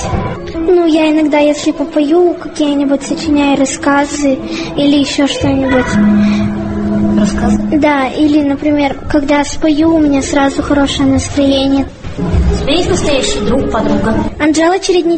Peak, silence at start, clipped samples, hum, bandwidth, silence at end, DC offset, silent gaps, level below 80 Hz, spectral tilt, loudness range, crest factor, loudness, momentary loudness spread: 0 dBFS; 0 s; under 0.1%; none; 8.8 kHz; 0 s; under 0.1%; none; -26 dBFS; -5 dB/octave; 1 LU; 10 dB; -12 LUFS; 5 LU